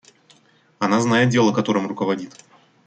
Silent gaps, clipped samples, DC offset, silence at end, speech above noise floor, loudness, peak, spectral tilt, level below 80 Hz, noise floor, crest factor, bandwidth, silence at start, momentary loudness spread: none; under 0.1%; under 0.1%; 0.6 s; 37 dB; -20 LUFS; -4 dBFS; -5.5 dB/octave; -64 dBFS; -57 dBFS; 18 dB; 9.2 kHz; 0.8 s; 10 LU